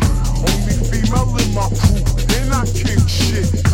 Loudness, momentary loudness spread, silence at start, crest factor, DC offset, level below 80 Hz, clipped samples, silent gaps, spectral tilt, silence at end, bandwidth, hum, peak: -17 LUFS; 2 LU; 0 s; 14 dB; under 0.1%; -18 dBFS; under 0.1%; none; -5 dB/octave; 0 s; 16.5 kHz; none; 0 dBFS